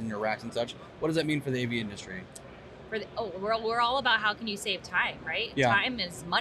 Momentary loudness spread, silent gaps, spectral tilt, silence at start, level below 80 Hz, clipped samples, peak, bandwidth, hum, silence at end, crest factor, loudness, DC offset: 15 LU; none; -4.5 dB/octave; 0 s; -60 dBFS; under 0.1%; -12 dBFS; 13.5 kHz; none; 0 s; 18 dB; -29 LUFS; under 0.1%